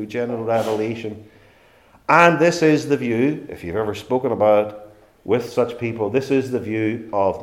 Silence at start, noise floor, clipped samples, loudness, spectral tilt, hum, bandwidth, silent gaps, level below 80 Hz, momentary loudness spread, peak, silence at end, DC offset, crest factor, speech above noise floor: 0 s; -52 dBFS; under 0.1%; -20 LUFS; -6 dB/octave; none; 15.5 kHz; none; -58 dBFS; 14 LU; 0 dBFS; 0 s; under 0.1%; 20 dB; 33 dB